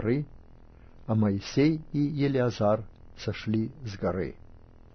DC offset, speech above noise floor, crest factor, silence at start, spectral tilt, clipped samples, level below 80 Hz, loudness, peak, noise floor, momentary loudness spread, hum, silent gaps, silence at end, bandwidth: under 0.1%; 23 dB; 16 dB; 0 s; -7.5 dB/octave; under 0.1%; -50 dBFS; -29 LUFS; -12 dBFS; -51 dBFS; 12 LU; none; none; 0.35 s; 6.6 kHz